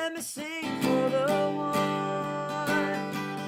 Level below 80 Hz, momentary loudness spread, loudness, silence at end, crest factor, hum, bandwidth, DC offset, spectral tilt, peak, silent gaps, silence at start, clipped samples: -68 dBFS; 7 LU; -29 LUFS; 0 s; 14 dB; none; 16.5 kHz; under 0.1%; -5 dB/octave; -14 dBFS; none; 0 s; under 0.1%